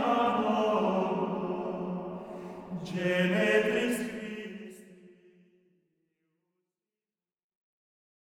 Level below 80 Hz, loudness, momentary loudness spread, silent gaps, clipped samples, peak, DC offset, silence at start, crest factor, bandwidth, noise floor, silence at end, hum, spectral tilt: -70 dBFS; -30 LUFS; 16 LU; none; under 0.1%; -12 dBFS; under 0.1%; 0 s; 20 dB; 17.5 kHz; under -90 dBFS; 3.15 s; none; -6 dB/octave